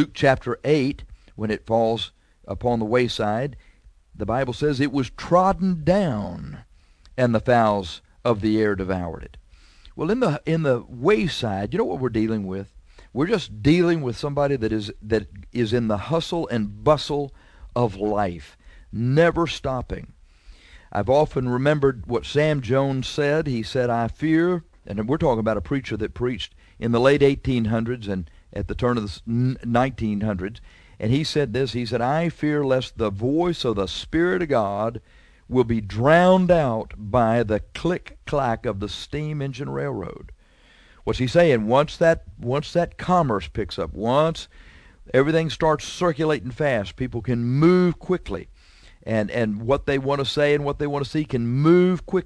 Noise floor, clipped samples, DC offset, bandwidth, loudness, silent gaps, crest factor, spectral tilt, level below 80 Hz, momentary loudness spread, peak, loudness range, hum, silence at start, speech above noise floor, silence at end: -53 dBFS; under 0.1%; under 0.1%; 11 kHz; -22 LUFS; none; 20 dB; -7 dB/octave; -44 dBFS; 11 LU; -2 dBFS; 4 LU; none; 0 s; 32 dB; 0 s